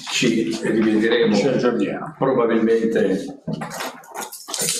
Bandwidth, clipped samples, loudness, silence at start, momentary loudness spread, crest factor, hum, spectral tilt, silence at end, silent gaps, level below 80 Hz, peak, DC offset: 15 kHz; under 0.1%; -20 LUFS; 0 s; 13 LU; 20 dB; none; -4 dB/octave; 0 s; none; -60 dBFS; 0 dBFS; under 0.1%